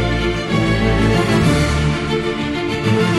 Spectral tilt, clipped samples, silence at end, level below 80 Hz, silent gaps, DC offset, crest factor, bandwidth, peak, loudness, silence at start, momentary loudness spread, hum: -6 dB/octave; under 0.1%; 0 s; -26 dBFS; none; under 0.1%; 12 dB; 13 kHz; -4 dBFS; -17 LUFS; 0 s; 5 LU; none